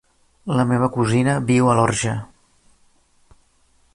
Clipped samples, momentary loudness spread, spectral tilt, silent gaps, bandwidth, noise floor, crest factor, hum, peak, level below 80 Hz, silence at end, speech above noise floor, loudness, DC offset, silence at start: under 0.1%; 9 LU; -6 dB/octave; none; 11.5 kHz; -59 dBFS; 18 dB; none; -4 dBFS; -50 dBFS; 1.7 s; 41 dB; -19 LUFS; under 0.1%; 0.45 s